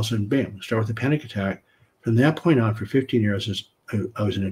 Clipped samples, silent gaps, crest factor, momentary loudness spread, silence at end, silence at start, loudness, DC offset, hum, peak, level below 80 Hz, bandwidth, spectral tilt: under 0.1%; none; 18 dB; 9 LU; 0 s; 0 s; -24 LUFS; under 0.1%; none; -4 dBFS; -58 dBFS; 15.5 kHz; -7 dB/octave